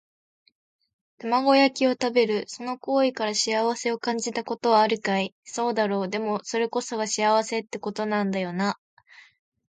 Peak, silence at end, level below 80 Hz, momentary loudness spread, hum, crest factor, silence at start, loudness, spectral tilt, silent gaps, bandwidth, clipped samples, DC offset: -8 dBFS; 0.95 s; -76 dBFS; 9 LU; none; 18 dB; 1.2 s; -25 LUFS; -3.5 dB/octave; 5.32-5.43 s; 9.4 kHz; under 0.1%; under 0.1%